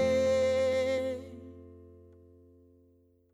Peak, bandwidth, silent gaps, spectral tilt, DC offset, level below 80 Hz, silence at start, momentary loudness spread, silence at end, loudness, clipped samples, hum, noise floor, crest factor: -18 dBFS; 12 kHz; none; -5 dB/octave; under 0.1%; -60 dBFS; 0 s; 23 LU; 1.55 s; -29 LUFS; under 0.1%; none; -65 dBFS; 14 dB